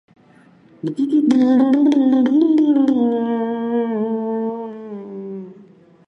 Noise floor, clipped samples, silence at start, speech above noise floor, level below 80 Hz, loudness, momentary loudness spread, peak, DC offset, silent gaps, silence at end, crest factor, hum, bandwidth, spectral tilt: -50 dBFS; under 0.1%; 0.85 s; 35 dB; -72 dBFS; -17 LUFS; 17 LU; -4 dBFS; under 0.1%; none; 0.45 s; 14 dB; none; 7.4 kHz; -7.5 dB/octave